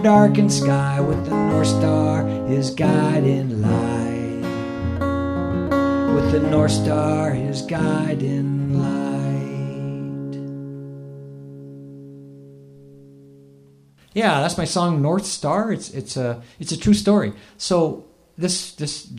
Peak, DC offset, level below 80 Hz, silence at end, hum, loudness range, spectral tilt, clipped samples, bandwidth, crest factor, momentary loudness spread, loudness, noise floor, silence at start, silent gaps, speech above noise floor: -2 dBFS; under 0.1%; -46 dBFS; 0 s; none; 13 LU; -6 dB/octave; under 0.1%; 14 kHz; 20 dB; 15 LU; -21 LUFS; -52 dBFS; 0 s; none; 33 dB